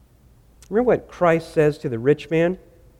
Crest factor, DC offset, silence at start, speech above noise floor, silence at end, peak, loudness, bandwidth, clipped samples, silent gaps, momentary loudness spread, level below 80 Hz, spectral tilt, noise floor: 16 dB; under 0.1%; 0.7 s; 33 dB; 0.45 s; -6 dBFS; -21 LUFS; 12.5 kHz; under 0.1%; none; 5 LU; -50 dBFS; -7.5 dB/octave; -53 dBFS